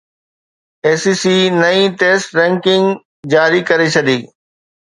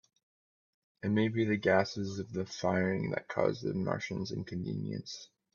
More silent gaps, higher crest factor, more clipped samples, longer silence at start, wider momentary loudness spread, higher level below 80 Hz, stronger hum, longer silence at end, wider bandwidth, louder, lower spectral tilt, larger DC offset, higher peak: first, 3.05-3.23 s vs none; second, 14 dB vs 22 dB; neither; second, 0.85 s vs 1.05 s; second, 6 LU vs 10 LU; first, -60 dBFS vs -70 dBFS; neither; first, 0.65 s vs 0.3 s; first, 11 kHz vs 7.2 kHz; first, -13 LUFS vs -33 LUFS; second, -4.5 dB/octave vs -6.5 dB/octave; neither; first, 0 dBFS vs -12 dBFS